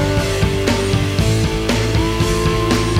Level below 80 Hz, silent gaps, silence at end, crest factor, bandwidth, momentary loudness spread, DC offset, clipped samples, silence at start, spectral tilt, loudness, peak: -26 dBFS; none; 0 s; 14 dB; 16 kHz; 1 LU; under 0.1%; under 0.1%; 0 s; -5.5 dB/octave; -17 LUFS; -2 dBFS